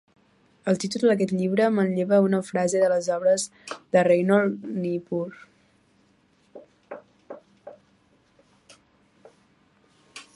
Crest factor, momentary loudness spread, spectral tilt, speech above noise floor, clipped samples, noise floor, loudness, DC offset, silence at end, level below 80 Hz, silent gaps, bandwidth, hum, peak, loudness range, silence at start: 18 dB; 24 LU; -6 dB/octave; 40 dB; under 0.1%; -63 dBFS; -23 LUFS; under 0.1%; 0.15 s; -72 dBFS; none; 11.5 kHz; none; -6 dBFS; 13 LU; 0.65 s